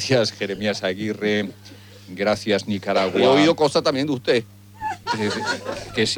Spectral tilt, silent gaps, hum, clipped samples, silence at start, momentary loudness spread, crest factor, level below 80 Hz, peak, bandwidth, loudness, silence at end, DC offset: -4.5 dB/octave; none; none; under 0.1%; 0 s; 11 LU; 16 dB; -56 dBFS; -4 dBFS; over 20 kHz; -21 LUFS; 0 s; under 0.1%